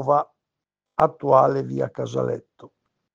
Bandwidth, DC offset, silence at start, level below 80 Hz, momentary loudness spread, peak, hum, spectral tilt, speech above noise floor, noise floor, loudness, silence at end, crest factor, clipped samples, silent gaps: 7.6 kHz; under 0.1%; 0 s; -62 dBFS; 14 LU; -2 dBFS; none; -8 dB/octave; 64 dB; -85 dBFS; -22 LUFS; 0.5 s; 22 dB; under 0.1%; none